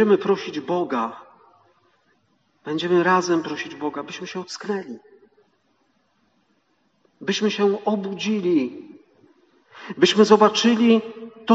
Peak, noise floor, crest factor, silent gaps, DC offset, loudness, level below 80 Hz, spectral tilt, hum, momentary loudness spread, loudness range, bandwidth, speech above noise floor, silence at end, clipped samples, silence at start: -2 dBFS; -67 dBFS; 20 dB; none; under 0.1%; -21 LUFS; -76 dBFS; -3.5 dB/octave; none; 18 LU; 13 LU; 8 kHz; 46 dB; 0 s; under 0.1%; 0 s